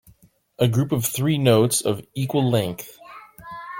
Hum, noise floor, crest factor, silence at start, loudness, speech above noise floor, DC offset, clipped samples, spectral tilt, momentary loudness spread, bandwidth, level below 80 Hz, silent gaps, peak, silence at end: none; -55 dBFS; 18 dB; 0.6 s; -21 LUFS; 35 dB; under 0.1%; under 0.1%; -5.5 dB/octave; 21 LU; 17 kHz; -56 dBFS; none; -4 dBFS; 0 s